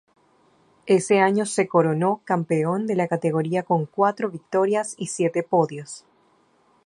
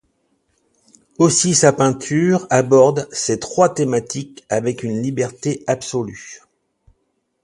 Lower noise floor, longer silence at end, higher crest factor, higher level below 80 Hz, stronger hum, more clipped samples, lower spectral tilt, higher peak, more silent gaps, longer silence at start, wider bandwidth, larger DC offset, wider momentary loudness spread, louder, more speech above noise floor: second, -61 dBFS vs -69 dBFS; second, 0.85 s vs 1.05 s; about the same, 20 dB vs 18 dB; second, -70 dBFS vs -56 dBFS; neither; neither; first, -6 dB/octave vs -4.5 dB/octave; second, -4 dBFS vs 0 dBFS; neither; second, 0.85 s vs 1.2 s; about the same, 11.5 kHz vs 11.5 kHz; neither; second, 9 LU vs 12 LU; second, -22 LUFS vs -17 LUFS; second, 40 dB vs 52 dB